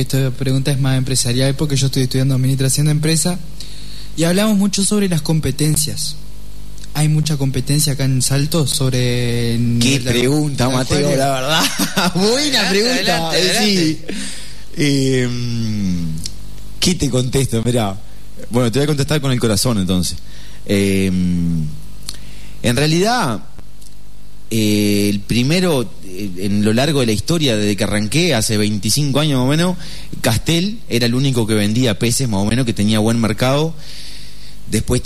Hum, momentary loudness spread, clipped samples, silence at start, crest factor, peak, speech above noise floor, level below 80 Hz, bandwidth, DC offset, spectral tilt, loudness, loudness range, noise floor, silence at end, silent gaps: 50 Hz at -40 dBFS; 13 LU; under 0.1%; 0 s; 14 dB; -2 dBFS; 24 dB; -36 dBFS; 13.5 kHz; 6%; -4.5 dB/octave; -16 LUFS; 4 LU; -40 dBFS; 0 s; none